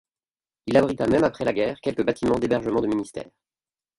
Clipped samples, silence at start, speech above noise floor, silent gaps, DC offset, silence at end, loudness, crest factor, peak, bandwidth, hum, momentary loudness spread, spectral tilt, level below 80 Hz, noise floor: under 0.1%; 0.65 s; over 67 dB; none; under 0.1%; 0.75 s; -23 LUFS; 20 dB; -4 dBFS; 11.5 kHz; none; 9 LU; -6.5 dB/octave; -52 dBFS; under -90 dBFS